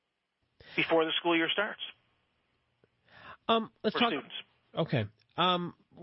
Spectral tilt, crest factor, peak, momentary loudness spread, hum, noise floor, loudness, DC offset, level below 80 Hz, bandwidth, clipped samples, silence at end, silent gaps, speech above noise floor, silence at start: -9 dB/octave; 20 dB; -14 dBFS; 14 LU; none; -81 dBFS; -30 LUFS; under 0.1%; -72 dBFS; 5.8 kHz; under 0.1%; 0 s; none; 51 dB; 0.65 s